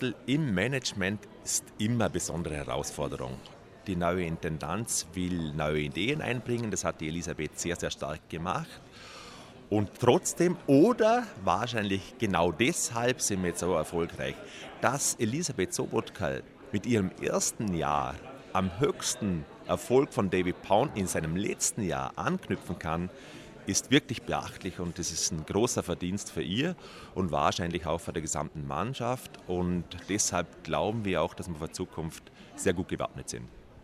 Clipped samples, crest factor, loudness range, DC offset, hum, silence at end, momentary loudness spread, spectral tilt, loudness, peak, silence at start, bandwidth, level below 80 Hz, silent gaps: under 0.1%; 24 dB; 6 LU; under 0.1%; none; 0 s; 11 LU; -4.5 dB/octave; -30 LUFS; -8 dBFS; 0 s; 15.5 kHz; -54 dBFS; none